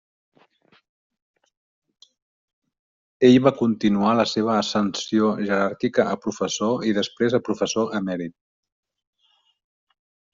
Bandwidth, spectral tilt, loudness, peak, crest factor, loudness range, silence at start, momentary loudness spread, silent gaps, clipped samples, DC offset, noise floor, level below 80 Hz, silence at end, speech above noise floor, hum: 7.6 kHz; -5 dB/octave; -21 LUFS; -4 dBFS; 20 dB; 6 LU; 3.2 s; 9 LU; none; under 0.1%; under 0.1%; -66 dBFS; -62 dBFS; 2.05 s; 45 dB; none